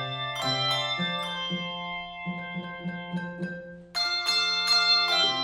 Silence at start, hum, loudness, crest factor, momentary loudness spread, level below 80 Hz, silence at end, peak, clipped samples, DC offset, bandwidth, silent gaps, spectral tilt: 0 s; none; -26 LUFS; 18 dB; 15 LU; -62 dBFS; 0 s; -12 dBFS; under 0.1%; under 0.1%; 16 kHz; none; -3 dB/octave